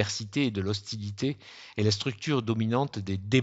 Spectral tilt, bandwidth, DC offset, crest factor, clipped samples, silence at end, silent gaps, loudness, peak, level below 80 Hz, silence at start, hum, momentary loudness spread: -5.5 dB/octave; 8 kHz; under 0.1%; 22 dB; under 0.1%; 0 s; none; -30 LUFS; -8 dBFS; -66 dBFS; 0 s; none; 7 LU